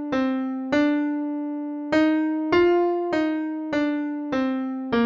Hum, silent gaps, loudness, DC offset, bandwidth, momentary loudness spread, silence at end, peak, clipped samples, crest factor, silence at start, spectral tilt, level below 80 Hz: none; none; -24 LUFS; under 0.1%; 7.4 kHz; 8 LU; 0 s; -8 dBFS; under 0.1%; 16 dB; 0 s; -6 dB/octave; -56 dBFS